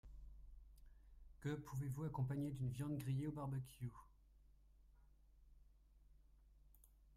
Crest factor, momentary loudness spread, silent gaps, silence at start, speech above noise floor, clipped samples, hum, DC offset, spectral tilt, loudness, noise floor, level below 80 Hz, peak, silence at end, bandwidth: 16 dB; 21 LU; none; 0.05 s; 24 dB; under 0.1%; none; under 0.1%; -8 dB/octave; -47 LUFS; -69 dBFS; -64 dBFS; -34 dBFS; 0 s; 15.5 kHz